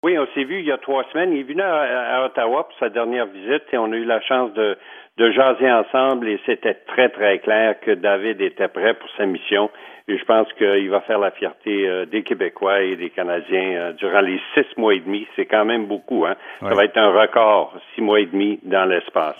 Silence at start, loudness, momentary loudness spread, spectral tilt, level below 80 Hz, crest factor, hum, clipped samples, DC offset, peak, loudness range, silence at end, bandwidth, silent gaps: 0.05 s; -19 LUFS; 8 LU; -6.5 dB/octave; -76 dBFS; 18 dB; none; under 0.1%; under 0.1%; -2 dBFS; 3 LU; 0.05 s; 3.7 kHz; none